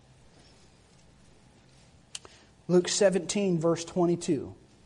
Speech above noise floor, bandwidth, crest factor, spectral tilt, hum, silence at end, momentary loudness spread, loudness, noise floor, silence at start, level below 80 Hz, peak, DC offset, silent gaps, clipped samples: 32 dB; 11 kHz; 18 dB; -5 dB/octave; none; 0.3 s; 19 LU; -27 LUFS; -58 dBFS; 2.15 s; -64 dBFS; -12 dBFS; under 0.1%; none; under 0.1%